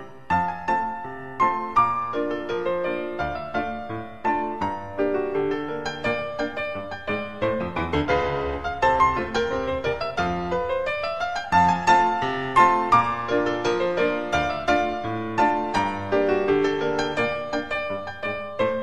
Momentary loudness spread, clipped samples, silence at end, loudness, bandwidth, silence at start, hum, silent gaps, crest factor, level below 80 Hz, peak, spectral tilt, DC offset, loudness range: 10 LU; under 0.1%; 0 s; -24 LUFS; 11.5 kHz; 0 s; none; none; 20 dB; -46 dBFS; -4 dBFS; -5.5 dB/octave; 0.7%; 6 LU